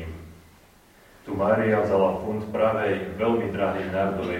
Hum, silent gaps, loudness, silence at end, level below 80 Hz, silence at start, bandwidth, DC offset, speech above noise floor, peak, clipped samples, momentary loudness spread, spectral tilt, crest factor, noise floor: none; none; -24 LUFS; 0 s; -52 dBFS; 0 s; 16 kHz; under 0.1%; 30 dB; -8 dBFS; under 0.1%; 12 LU; -7.5 dB/octave; 18 dB; -54 dBFS